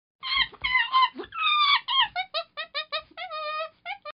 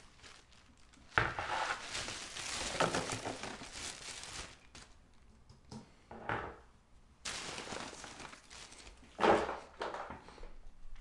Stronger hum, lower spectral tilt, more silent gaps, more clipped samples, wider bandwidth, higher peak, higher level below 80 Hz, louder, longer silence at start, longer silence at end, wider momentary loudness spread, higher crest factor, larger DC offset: neither; second, 4 dB/octave vs -3 dB/octave; neither; neither; second, 5.6 kHz vs 11.5 kHz; about the same, -10 dBFS vs -10 dBFS; about the same, -60 dBFS vs -58 dBFS; first, -25 LUFS vs -38 LUFS; first, 0.25 s vs 0 s; about the same, 0.1 s vs 0 s; second, 13 LU vs 22 LU; second, 18 dB vs 30 dB; neither